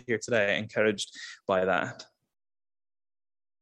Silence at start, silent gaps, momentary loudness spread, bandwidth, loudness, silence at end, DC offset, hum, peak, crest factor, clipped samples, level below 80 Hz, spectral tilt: 0.1 s; none; 12 LU; 12 kHz; -28 LUFS; 1.6 s; under 0.1%; none; -10 dBFS; 20 dB; under 0.1%; -72 dBFS; -4 dB/octave